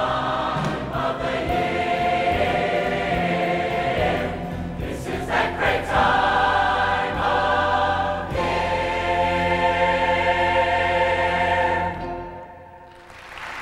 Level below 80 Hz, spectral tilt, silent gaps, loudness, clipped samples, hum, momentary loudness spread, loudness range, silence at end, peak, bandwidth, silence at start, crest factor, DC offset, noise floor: -40 dBFS; -5.5 dB/octave; none; -21 LUFS; under 0.1%; none; 10 LU; 3 LU; 0 s; -6 dBFS; 15.5 kHz; 0 s; 16 dB; under 0.1%; -43 dBFS